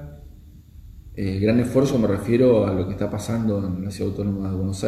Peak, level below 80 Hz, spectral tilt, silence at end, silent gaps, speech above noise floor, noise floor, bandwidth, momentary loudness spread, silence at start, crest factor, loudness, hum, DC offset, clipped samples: -6 dBFS; -44 dBFS; -7.5 dB/octave; 0 s; none; 24 dB; -45 dBFS; 14.5 kHz; 10 LU; 0 s; 16 dB; -22 LUFS; none; under 0.1%; under 0.1%